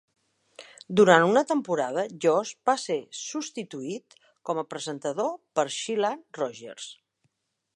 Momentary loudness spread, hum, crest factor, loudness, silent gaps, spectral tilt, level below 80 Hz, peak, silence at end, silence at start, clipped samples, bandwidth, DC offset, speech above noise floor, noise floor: 19 LU; none; 24 dB; -26 LUFS; none; -4 dB/octave; -74 dBFS; -2 dBFS; 0.8 s; 0.6 s; under 0.1%; 11.5 kHz; under 0.1%; 50 dB; -76 dBFS